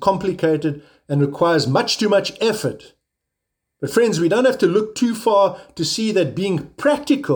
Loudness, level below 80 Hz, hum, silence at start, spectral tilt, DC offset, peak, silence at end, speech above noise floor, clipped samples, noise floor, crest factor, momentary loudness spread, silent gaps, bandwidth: -19 LUFS; -58 dBFS; none; 0 s; -5 dB/octave; under 0.1%; -2 dBFS; 0 s; 61 dB; under 0.1%; -79 dBFS; 18 dB; 8 LU; none; over 20 kHz